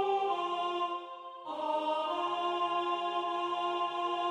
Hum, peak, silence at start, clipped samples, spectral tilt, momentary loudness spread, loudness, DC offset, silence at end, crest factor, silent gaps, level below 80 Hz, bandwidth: none; -20 dBFS; 0 s; under 0.1%; -3.5 dB/octave; 7 LU; -33 LUFS; under 0.1%; 0 s; 12 dB; none; under -90 dBFS; 10.5 kHz